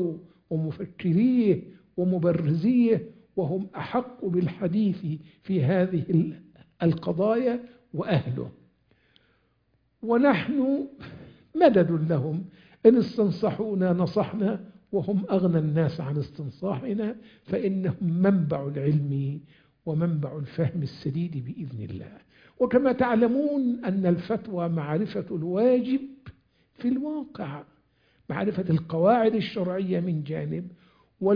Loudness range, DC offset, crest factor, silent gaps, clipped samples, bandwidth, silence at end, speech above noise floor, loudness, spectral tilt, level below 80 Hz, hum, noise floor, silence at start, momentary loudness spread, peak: 5 LU; under 0.1%; 22 dB; none; under 0.1%; 5.2 kHz; 0 s; 44 dB; -26 LUFS; -10.5 dB/octave; -62 dBFS; none; -69 dBFS; 0 s; 14 LU; -4 dBFS